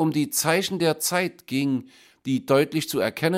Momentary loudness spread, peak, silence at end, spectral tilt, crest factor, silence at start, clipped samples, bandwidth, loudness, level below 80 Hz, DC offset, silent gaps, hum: 7 LU; -4 dBFS; 0 s; -4 dB/octave; 20 dB; 0 s; under 0.1%; 16.5 kHz; -24 LUFS; -68 dBFS; under 0.1%; none; none